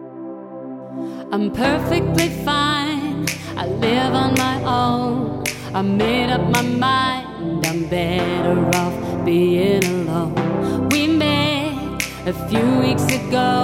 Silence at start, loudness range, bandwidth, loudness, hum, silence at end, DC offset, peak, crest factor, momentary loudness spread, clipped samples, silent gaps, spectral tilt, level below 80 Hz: 0 s; 2 LU; 16.5 kHz; -19 LUFS; none; 0 s; under 0.1%; 0 dBFS; 18 dB; 9 LU; under 0.1%; none; -5 dB/octave; -42 dBFS